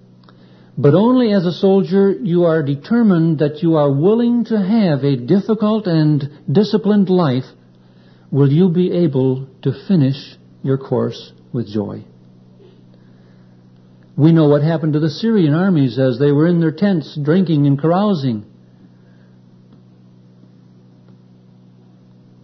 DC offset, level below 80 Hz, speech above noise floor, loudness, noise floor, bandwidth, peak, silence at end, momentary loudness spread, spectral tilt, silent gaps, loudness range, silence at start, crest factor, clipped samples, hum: under 0.1%; -60 dBFS; 32 dB; -15 LUFS; -46 dBFS; 6.2 kHz; 0 dBFS; 4 s; 10 LU; -9.5 dB/octave; none; 9 LU; 0.75 s; 16 dB; under 0.1%; none